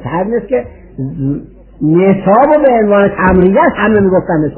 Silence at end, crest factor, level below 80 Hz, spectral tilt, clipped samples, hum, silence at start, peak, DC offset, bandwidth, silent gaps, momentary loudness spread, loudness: 0 s; 10 dB; -32 dBFS; -12 dB/octave; 0.1%; none; 0 s; 0 dBFS; under 0.1%; 3.3 kHz; none; 10 LU; -10 LUFS